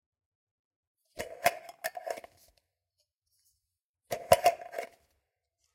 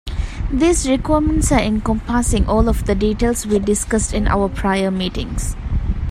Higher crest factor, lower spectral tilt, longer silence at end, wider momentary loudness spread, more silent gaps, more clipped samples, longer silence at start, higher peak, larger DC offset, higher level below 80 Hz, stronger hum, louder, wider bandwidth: first, 30 dB vs 16 dB; second, -2.5 dB/octave vs -5 dB/octave; first, 0.9 s vs 0 s; first, 18 LU vs 8 LU; first, 3.18-3.22 s, 3.84-3.94 s vs none; neither; first, 1.15 s vs 0.05 s; second, -6 dBFS vs -2 dBFS; neither; second, -66 dBFS vs -24 dBFS; neither; second, -31 LUFS vs -18 LUFS; about the same, 16.5 kHz vs 15.5 kHz